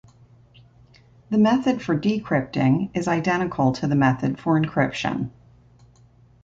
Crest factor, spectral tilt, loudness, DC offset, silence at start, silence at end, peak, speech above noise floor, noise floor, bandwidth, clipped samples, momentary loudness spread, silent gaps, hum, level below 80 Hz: 16 dB; -7 dB/octave; -22 LUFS; under 0.1%; 1.3 s; 1.15 s; -6 dBFS; 33 dB; -54 dBFS; 7.8 kHz; under 0.1%; 6 LU; none; 60 Hz at -45 dBFS; -54 dBFS